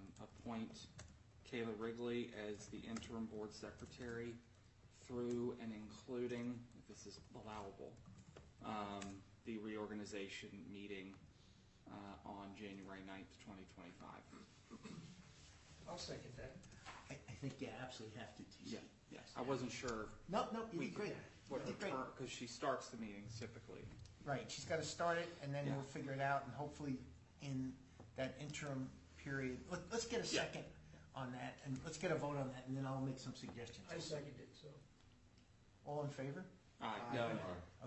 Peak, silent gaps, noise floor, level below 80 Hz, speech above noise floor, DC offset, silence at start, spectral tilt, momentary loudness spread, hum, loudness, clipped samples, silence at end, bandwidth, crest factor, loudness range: -26 dBFS; none; -69 dBFS; -72 dBFS; 21 dB; under 0.1%; 0 s; -5 dB/octave; 16 LU; none; -48 LUFS; under 0.1%; 0 s; 8.2 kHz; 22 dB; 10 LU